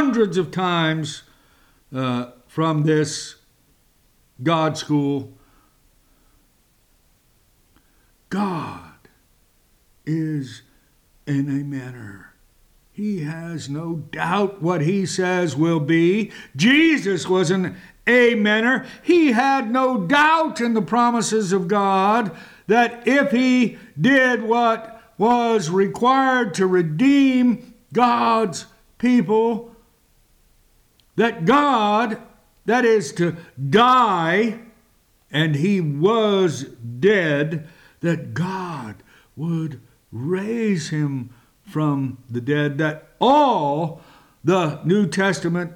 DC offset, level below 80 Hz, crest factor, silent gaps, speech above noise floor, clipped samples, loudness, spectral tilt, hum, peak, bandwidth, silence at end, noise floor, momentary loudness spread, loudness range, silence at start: under 0.1%; -60 dBFS; 14 dB; none; 41 dB; under 0.1%; -20 LUFS; -5.5 dB/octave; none; -6 dBFS; 14.5 kHz; 0 s; -60 dBFS; 14 LU; 11 LU; 0 s